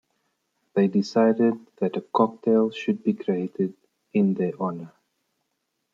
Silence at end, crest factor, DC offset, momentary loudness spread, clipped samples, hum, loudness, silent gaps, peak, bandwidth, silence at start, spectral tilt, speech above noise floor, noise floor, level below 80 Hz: 1.05 s; 20 dB; under 0.1%; 9 LU; under 0.1%; none; -24 LUFS; none; -4 dBFS; 7.4 kHz; 0.75 s; -8 dB/octave; 54 dB; -77 dBFS; -74 dBFS